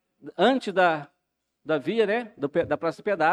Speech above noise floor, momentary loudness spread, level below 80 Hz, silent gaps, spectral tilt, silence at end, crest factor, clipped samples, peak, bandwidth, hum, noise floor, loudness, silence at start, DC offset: 55 dB; 8 LU; -66 dBFS; none; -6 dB/octave; 0 s; 16 dB; under 0.1%; -8 dBFS; 10.5 kHz; none; -79 dBFS; -25 LUFS; 0.25 s; under 0.1%